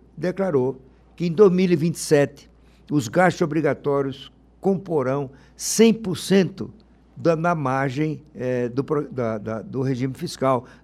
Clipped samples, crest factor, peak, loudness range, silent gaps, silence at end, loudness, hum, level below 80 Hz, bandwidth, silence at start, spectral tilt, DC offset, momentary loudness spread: under 0.1%; 18 dB; -4 dBFS; 4 LU; none; 0.2 s; -22 LUFS; none; -56 dBFS; 15 kHz; 0.15 s; -6 dB/octave; under 0.1%; 11 LU